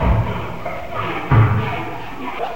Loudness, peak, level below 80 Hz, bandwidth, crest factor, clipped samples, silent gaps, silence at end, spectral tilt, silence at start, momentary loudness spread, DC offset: -20 LUFS; -2 dBFS; -28 dBFS; 16 kHz; 16 dB; under 0.1%; none; 0 s; -8 dB/octave; 0 s; 13 LU; 3%